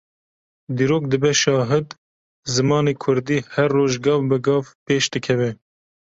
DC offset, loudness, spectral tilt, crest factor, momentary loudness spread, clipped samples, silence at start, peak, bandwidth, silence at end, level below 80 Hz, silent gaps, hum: under 0.1%; -20 LUFS; -5 dB/octave; 16 dB; 6 LU; under 0.1%; 0.7 s; -4 dBFS; 8 kHz; 0.6 s; -56 dBFS; 1.98-2.43 s, 4.75-4.86 s; none